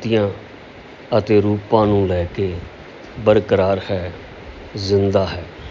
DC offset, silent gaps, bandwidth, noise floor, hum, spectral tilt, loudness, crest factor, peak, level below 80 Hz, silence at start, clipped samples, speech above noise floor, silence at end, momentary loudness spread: under 0.1%; none; 7.6 kHz; -39 dBFS; none; -7.5 dB/octave; -18 LUFS; 18 dB; -2 dBFS; -38 dBFS; 0 s; under 0.1%; 21 dB; 0 s; 21 LU